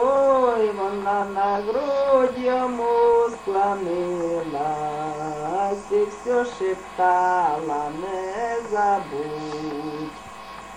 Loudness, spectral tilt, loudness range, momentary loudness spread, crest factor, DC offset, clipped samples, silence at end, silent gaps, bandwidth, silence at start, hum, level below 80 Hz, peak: -23 LUFS; -5.5 dB/octave; 4 LU; 11 LU; 16 dB; under 0.1%; under 0.1%; 0 s; none; 11 kHz; 0 s; none; -54 dBFS; -6 dBFS